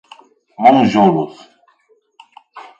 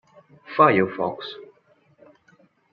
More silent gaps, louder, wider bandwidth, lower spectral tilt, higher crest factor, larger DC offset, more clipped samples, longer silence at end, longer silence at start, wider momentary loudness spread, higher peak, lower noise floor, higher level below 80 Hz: neither; first, -12 LUFS vs -20 LUFS; first, 7.6 kHz vs 5.4 kHz; first, -7 dB/octave vs -4 dB/octave; second, 16 dB vs 22 dB; neither; neither; second, 0.2 s vs 1.3 s; about the same, 0.6 s vs 0.5 s; second, 11 LU vs 19 LU; about the same, 0 dBFS vs -2 dBFS; about the same, -57 dBFS vs -60 dBFS; first, -60 dBFS vs -68 dBFS